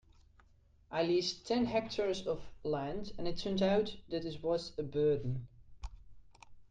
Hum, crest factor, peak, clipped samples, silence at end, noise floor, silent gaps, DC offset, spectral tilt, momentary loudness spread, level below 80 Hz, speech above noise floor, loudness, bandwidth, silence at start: none; 16 dB; -20 dBFS; under 0.1%; 0.05 s; -65 dBFS; none; under 0.1%; -6 dB/octave; 11 LU; -54 dBFS; 31 dB; -36 LUFS; 9.4 kHz; 0.9 s